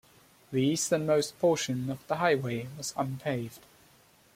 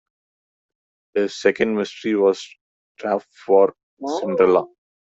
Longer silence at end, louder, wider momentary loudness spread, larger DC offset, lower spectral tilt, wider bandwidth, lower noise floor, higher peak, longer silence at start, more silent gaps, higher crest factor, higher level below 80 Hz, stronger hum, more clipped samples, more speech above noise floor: first, 0.75 s vs 0.4 s; second, -30 LUFS vs -20 LUFS; second, 9 LU vs 13 LU; neither; about the same, -4.5 dB/octave vs -5.5 dB/octave; first, 16.5 kHz vs 8 kHz; second, -61 dBFS vs under -90 dBFS; second, -12 dBFS vs -2 dBFS; second, 0.5 s vs 1.15 s; second, none vs 2.61-2.95 s, 3.83-3.97 s; about the same, 18 dB vs 18 dB; about the same, -68 dBFS vs -64 dBFS; neither; neither; second, 32 dB vs over 71 dB